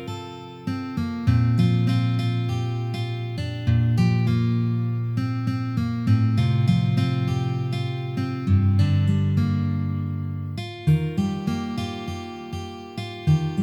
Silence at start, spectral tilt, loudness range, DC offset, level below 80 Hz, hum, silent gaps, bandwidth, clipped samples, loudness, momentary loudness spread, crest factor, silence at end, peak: 0 s; -8 dB/octave; 4 LU; under 0.1%; -46 dBFS; none; none; 10 kHz; under 0.1%; -24 LUFS; 12 LU; 16 dB; 0 s; -6 dBFS